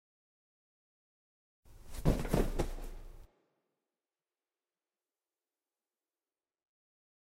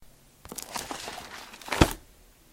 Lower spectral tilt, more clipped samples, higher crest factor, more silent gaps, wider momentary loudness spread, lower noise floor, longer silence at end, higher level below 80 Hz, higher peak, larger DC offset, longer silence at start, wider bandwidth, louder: first, -6.5 dB/octave vs -4.5 dB/octave; neither; about the same, 28 dB vs 32 dB; neither; about the same, 19 LU vs 17 LU; first, under -90 dBFS vs -56 dBFS; first, 4.05 s vs 0.4 s; about the same, -44 dBFS vs -40 dBFS; second, -14 dBFS vs 0 dBFS; neither; first, 1.65 s vs 0 s; about the same, 16 kHz vs 16.5 kHz; second, -36 LUFS vs -30 LUFS